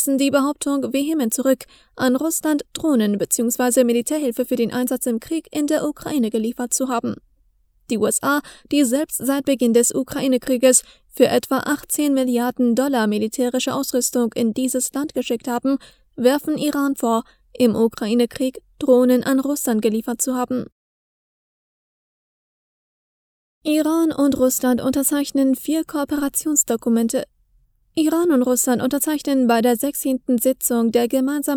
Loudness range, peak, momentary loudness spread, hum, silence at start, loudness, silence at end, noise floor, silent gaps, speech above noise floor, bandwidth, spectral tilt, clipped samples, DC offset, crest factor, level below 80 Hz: 5 LU; 0 dBFS; 7 LU; none; 0 s; -20 LUFS; 0 s; -60 dBFS; 20.72-23.61 s; 41 dB; 19.5 kHz; -3.5 dB/octave; under 0.1%; under 0.1%; 20 dB; -56 dBFS